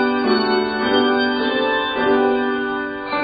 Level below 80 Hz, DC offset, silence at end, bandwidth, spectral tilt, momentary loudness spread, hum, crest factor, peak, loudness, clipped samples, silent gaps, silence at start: -52 dBFS; under 0.1%; 0 s; 5 kHz; -1.5 dB/octave; 6 LU; none; 14 dB; -4 dBFS; -18 LUFS; under 0.1%; none; 0 s